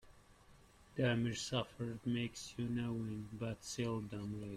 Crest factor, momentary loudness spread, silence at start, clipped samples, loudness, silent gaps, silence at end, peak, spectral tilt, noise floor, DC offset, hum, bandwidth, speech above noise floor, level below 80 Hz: 18 dB; 8 LU; 0.05 s; under 0.1%; -41 LUFS; none; 0 s; -22 dBFS; -5.5 dB/octave; -64 dBFS; under 0.1%; none; 14 kHz; 24 dB; -66 dBFS